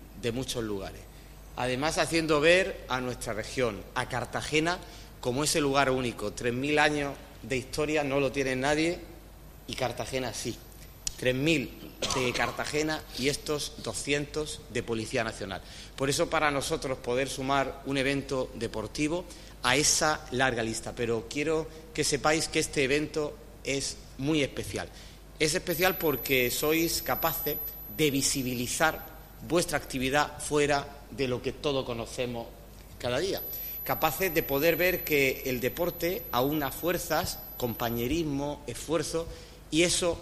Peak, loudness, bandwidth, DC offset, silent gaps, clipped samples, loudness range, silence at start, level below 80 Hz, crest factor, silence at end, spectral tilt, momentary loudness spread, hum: -6 dBFS; -29 LUFS; 15.5 kHz; under 0.1%; none; under 0.1%; 4 LU; 0 s; -48 dBFS; 24 dB; 0 s; -3.5 dB/octave; 11 LU; none